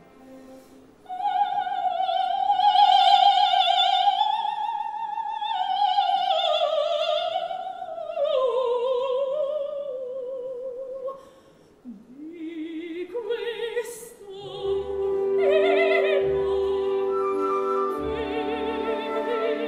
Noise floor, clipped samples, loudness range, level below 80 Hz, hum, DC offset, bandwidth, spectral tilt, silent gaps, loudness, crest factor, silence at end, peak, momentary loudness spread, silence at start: -54 dBFS; under 0.1%; 14 LU; -58 dBFS; none; under 0.1%; 14 kHz; -3.5 dB/octave; none; -24 LUFS; 18 dB; 0 s; -6 dBFS; 15 LU; 0.2 s